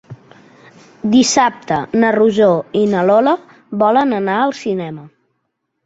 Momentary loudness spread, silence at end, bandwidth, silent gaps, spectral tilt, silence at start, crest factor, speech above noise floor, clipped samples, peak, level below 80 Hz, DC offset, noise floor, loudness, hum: 11 LU; 0.8 s; 8 kHz; none; -4.5 dB/octave; 0.1 s; 14 dB; 57 dB; under 0.1%; -2 dBFS; -56 dBFS; under 0.1%; -71 dBFS; -14 LUFS; none